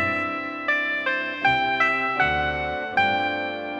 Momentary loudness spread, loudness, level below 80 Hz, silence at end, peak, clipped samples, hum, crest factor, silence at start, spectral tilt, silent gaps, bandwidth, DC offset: 6 LU; -23 LUFS; -48 dBFS; 0 s; -8 dBFS; under 0.1%; none; 16 dB; 0 s; -5 dB/octave; none; 8.4 kHz; under 0.1%